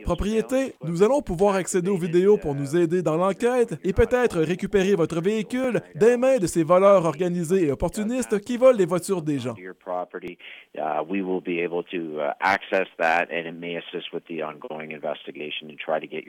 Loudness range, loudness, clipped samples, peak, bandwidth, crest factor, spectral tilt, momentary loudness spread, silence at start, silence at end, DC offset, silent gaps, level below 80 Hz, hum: 7 LU; -23 LUFS; under 0.1%; -6 dBFS; 16.5 kHz; 18 dB; -6 dB/octave; 13 LU; 0 s; 0.05 s; under 0.1%; none; -44 dBFS; none